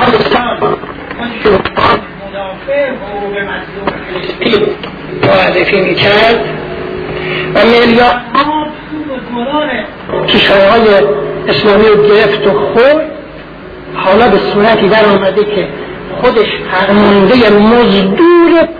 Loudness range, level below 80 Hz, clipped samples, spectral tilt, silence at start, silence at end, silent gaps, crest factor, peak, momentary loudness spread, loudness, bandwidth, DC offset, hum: 6 LU; -36 dBFS; 0.3%; -7.5 dB/octave; 0 s; 0 s; none; 10 dB; 0 dBFS; 14 LU; -9 LUFS; 5.4 kHz; under 0.1%; none